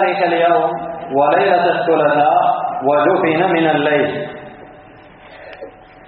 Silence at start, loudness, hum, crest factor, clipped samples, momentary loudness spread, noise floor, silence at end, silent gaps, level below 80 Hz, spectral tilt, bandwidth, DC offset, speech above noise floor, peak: 0 s; -15 LUFS; none; 16 dB; under 0.1%; 18 LU; -41 dBFS; 0.35 s; none; -56 dBFS; -3.5 dB/octave; 4.5 kHz; under 0.1%; 26 dB; 0 dBFS